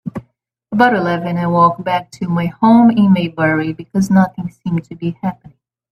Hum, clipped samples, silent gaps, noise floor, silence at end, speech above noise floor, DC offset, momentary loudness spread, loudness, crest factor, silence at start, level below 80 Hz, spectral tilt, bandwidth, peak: none; under 0.1%; none; -59 dBFS; 0.6 s; 45 dB; under 0.1%; 14 LU; -15 LUFS; 14 dB; 0.05 s; -52 dBFS; -7.5 dB/octave; 10 kHz; 0 dBFS